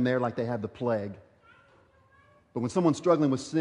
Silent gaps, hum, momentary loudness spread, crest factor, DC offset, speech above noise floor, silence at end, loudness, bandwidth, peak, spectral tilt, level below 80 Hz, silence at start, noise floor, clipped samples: none; none; 14 LU; 18 dB; under 0.1%; 34 dB; 0 s; -28 LUFS; 11 kHz; -10 dBFS; -7 dB/octave; -68 dBFS; 0 s; -61 dBFS; under 0.1%